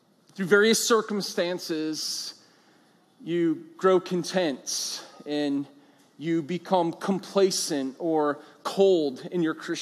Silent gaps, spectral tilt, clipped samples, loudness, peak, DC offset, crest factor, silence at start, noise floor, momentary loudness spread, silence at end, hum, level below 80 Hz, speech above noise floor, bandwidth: none; -4 dB/octave; under 0.1%; -26 LUFS; -6 dBFS; under 0.1%; 20 dB; 0.35 s; -61 dBFS; 11 LU; 0 s; none; -88 dBFS; 35 dB; 15.5 kHz